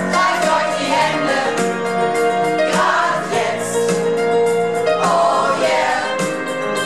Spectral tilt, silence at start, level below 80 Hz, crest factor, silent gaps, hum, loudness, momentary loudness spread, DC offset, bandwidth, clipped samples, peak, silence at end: -3.5 dB/octave; 0 s; -60 dBFS; 12 dB; none; none; -17 LUFS; 4 LU; 0.5%; 13.5 kHz; under 0.1%; -4 dBFS; 0 s